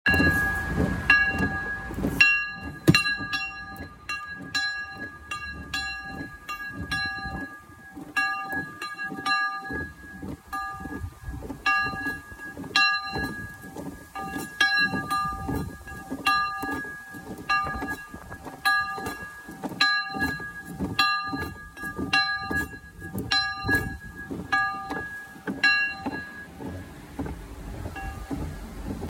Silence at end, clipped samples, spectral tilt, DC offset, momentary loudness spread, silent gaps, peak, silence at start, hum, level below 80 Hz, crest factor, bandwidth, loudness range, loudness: 0 s; under 0.1%; -4 dB/octave; under 0.1%; 18 LU; none; -4 dBFS; 0.05 s; none; -44 dBFS; 24 dB; 16.5 kHz; 7 LU; -26 LUFS